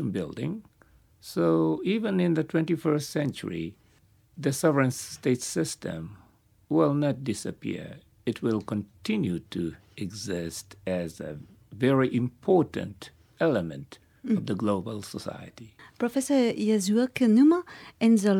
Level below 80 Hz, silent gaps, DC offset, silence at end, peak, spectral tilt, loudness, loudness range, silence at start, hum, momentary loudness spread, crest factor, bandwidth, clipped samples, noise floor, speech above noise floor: -62 dBFS; none; under 0.1%; 0 s; -10 dBFS; -6 dB/octave; -27 LUFS; 6 LU; 0 s; none; 16 LU; 18 dB; 17 kHz; under 0.1%; -62 dBFS; 35 dB